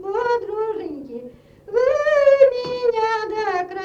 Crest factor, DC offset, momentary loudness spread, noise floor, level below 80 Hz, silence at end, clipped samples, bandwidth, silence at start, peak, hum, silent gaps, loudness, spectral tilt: 18 dB; under 0.1%; 17 LU; -41 dBFS; -56 dBFS; 0 s; under 0.1%; 7.2 kHz; 0 s; -2 dBFS; none; none; -19 LUFS; -4.5 dB/octave